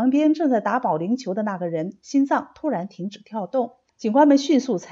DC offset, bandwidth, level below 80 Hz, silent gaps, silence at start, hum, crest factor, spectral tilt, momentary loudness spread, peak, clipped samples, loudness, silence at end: under 0.1%; 7.6 kHz; -72 dBFS; none; 0 s; none; 16 dB; -6 dB/octave; 14 LU; -6 dBFS; under 0.1%; -22 LUFS; 0 s